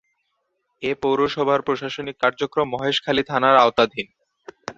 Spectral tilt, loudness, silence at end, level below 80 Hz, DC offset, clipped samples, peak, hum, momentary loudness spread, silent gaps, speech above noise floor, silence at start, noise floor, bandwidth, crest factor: -5 dB/octave; -20 LUFS; 0.05 s; -58 dBFS; under 0.1%; under 0.1%; -2 dBFS; none; 14 LU; none; 53 dB; 0.8 s; -73 dBFS; 7.8 kHz; 20 dB